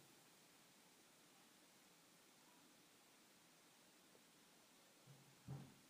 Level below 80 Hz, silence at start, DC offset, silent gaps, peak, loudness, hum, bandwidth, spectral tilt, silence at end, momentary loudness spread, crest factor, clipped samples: under -90 dBFS; 0 s; under 0.1%; none; -44 dBFS; -67 LUFS; none; 15.5 kHz; -4 dB/octave; 0 s; 6 LU; 22 dB; under 0.1%